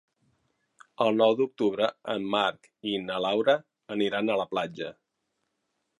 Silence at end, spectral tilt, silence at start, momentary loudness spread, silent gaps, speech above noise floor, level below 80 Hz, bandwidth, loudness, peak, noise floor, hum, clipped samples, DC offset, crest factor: 1.05 s; -5.5 dB/octave; 1 s; 11 LU; none; 53 dB; -74 dBFS; 11 kHz; -27 LUFS; -8 dBFS; -80 dBFS; none; under 0.1%; under 0.1%; 20 dB